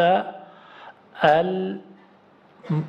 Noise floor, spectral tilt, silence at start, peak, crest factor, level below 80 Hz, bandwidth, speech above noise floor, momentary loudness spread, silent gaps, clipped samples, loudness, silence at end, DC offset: -54 dBFS; -7.5 dB/octave; 0 s; -4 dBFS; 20 dB; -64 dBFS; 7.6 kHz; 33 dB; 26 LU; none; under 0.1%; -22 LUFS; 0 s; under 0.1%